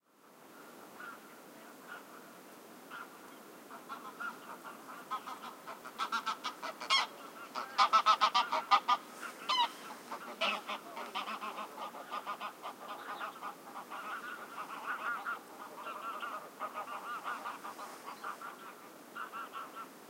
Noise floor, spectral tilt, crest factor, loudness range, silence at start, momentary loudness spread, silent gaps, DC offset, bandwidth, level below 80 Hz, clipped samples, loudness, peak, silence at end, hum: -60 dBFS; -1 dB/octave; 26 dB; 17 LU; 0.25 s; 22 LU; none; under 0.1%; 16 kHz; under -90 dBFS; under 0.1%; -37 LUFS; -12 dBFS; 0 s; none